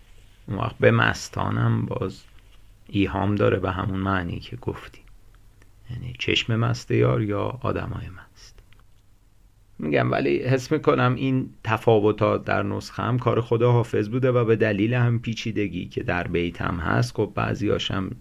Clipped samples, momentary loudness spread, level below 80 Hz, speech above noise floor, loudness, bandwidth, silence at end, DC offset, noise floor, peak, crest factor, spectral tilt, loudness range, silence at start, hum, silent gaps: under 0.1%; 10 LU; -44 dBFS; 32 dB; -24 LUFS; 12 kHz; 0 s; under 0.1%; -55 dBFS; -4 dBFS; 20 dB; -7 dB/octave; 5 LU; 0.45 s; none; none